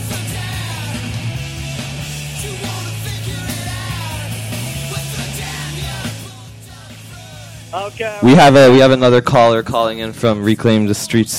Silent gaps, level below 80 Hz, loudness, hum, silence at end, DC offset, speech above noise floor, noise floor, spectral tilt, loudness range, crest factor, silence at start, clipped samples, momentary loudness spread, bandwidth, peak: none; -38 dBFS; -15 LUFS; none; 0 s; under 0.1%; 24 dB; -35 dBFS; -5.5 dB/octave; 14 LU; 14 dB; 0 s; under 0.1%; 25 LU; 16.5 kHz; -2 dBFS